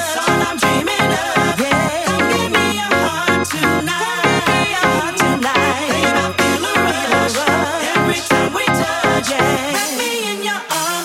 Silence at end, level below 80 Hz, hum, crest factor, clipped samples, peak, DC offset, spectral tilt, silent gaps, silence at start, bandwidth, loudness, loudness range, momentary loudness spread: 0 s; -46 dBFS; none; 16 dB; under 0.1%; 0 dBFS; under 0.1%; -3.5 dB/octave; none; 0 s; 16.5 kHz; -15 LUFS; 1 LU; 3 LU